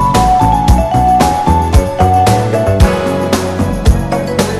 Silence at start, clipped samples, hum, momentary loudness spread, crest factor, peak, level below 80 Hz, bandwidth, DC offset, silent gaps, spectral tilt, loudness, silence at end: 0 s; 0.6%; none; 5 LU; 10 dB; 0 dBFS; -16 dBFS; 14.5 kHz; under 0.1%; none; -6 dB/octave; -11 LUFS; 0 s